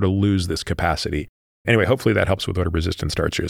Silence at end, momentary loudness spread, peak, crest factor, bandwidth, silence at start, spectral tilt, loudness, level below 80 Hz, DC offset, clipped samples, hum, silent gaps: 0 s; 8 LU; -2 dBFS; 18 dB; 15.5 kHz; 0 s; -6 dB/octave; -21 LUFS; -36 dBFS; under 0.1%; under 0.1%; none; 1.29-1.65 s